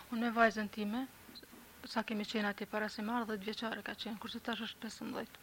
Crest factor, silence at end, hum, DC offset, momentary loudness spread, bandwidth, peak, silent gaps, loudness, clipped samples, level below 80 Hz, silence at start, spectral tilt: 22 dB; 0 s; none; under 0.1%; 16 LU; 16.5 kHz; -16 dBFS; none; -38 LUFS; under 0.1%; -72 dBFS; 0 s; -4.5 dB/octave